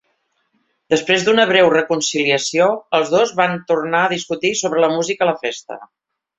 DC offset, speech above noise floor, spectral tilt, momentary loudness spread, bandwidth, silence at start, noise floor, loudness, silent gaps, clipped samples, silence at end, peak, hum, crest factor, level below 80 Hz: under 0.1%; 50 dB; -3 dB/octave; 7 LU; 8.4 kHz; 0.9 s; -67 dBFS; -16 LUFS; none; under 0.1%; 0.55 s; 0 dBFS; none; 16 dB; -62 dBFS